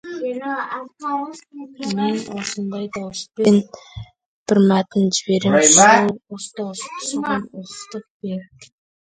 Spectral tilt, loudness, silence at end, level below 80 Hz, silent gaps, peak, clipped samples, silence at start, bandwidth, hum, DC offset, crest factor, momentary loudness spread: -3.5 dB/octave; -18 LUFS; 0.35 s; -58 dBFS; 4.26-4.46 s, 8.10-8.20 s; 0 dBFS; under 0.1%; 0.05 s; 9.6 kHz; none; under 0.1%; 20 dB; 21 LU